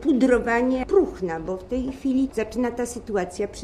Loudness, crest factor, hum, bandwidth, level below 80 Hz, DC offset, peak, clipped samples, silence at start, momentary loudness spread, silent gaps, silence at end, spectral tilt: -24 LUFS; 16 dB; none; 13.5 kHz; -44 dBFS; under 0.1%; -6 dBFS; under 0.1%; 0 s; 10 LU; none; 0 s; -5.5 dB/octave